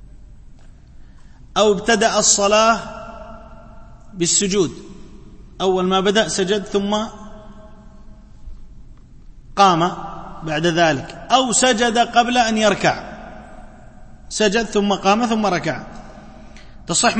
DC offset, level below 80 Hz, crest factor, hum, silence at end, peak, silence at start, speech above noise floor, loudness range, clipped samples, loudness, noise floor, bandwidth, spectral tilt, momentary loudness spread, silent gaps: under 0.1%; -42 dBFS; 20 dB; none; 0 s; 0 dBFS; 0.15 s; 24 dB; 6 LU; under 0.1%; -17 LUFS; -41 dBFS; 8.8 kHz; -3 dB/octave; 20 LU; none